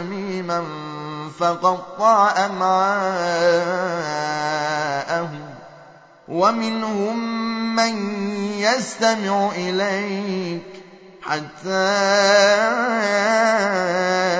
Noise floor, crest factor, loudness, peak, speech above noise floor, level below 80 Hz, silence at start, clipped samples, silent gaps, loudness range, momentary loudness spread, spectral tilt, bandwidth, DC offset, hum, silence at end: -46 dBFS; 18 dB; -20 LUFS; -2 dBFS; 27 dB; -70 dBFS; 0 s; under 0.1%; none; 5 LU; 11 LU; -4 dB/octave; 8 kHz; under 0.1%; none; 0 s